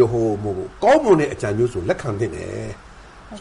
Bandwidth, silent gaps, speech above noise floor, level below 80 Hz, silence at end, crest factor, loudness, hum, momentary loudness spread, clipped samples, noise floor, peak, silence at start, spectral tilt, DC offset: 11.5 kHz; none; 20 dB; -44 dBFS; 0 s; 16 dB; -20 LUFS; none; 17 LU; under 0.1%; -40 dBFS; -4 dBFS; 0 s; -7 dB/octave; under 0.1%